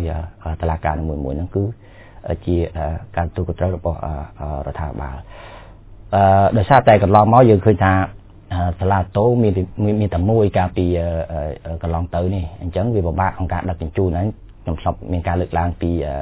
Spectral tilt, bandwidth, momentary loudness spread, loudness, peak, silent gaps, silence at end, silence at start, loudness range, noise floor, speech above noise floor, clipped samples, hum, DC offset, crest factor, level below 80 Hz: -12 dB/octave; 4 kHz; 15 LU; -18 LUFS; 0 dBFS; none; 0 s; 0 s; 10 LU; -39 dBFS; 22 dB; under 0.1%; none; under 0.1%; 18 dB; -30 dBFS